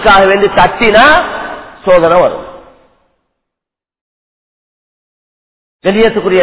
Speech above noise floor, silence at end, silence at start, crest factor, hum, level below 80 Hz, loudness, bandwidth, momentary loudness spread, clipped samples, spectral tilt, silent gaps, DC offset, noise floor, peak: 76 dB; 0 s; 0 s; 12 dB; none; -36 dBFS; -8 LUFS; 4 kHz; 14 LU; 0.7%; -8.5 dB/octave; 4.01-5.79 s; under 0.1%; -83 dBFS; 0 dBFS